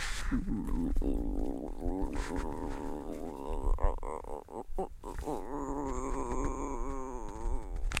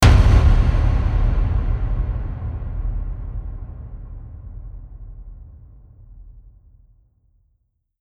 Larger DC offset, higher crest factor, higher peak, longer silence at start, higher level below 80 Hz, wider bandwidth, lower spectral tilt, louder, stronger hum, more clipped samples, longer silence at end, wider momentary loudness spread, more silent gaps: neither; about the same, 22 dB vs 18 dB; second, -12 dBFS vs -2 dBFS; about the same, 0 s vs 0 s; second, -36 dBFS vs -22 dBFS; about the same, 12 kHz vs 12 kHz; about the same, -5.5 dB/octave vs -6.5 dB/octave; second, -38 LUFS vs -21 LUFS; neither; neither; second, 0 s vs 1.6 s; second, 6 LU vs 25 LU; neither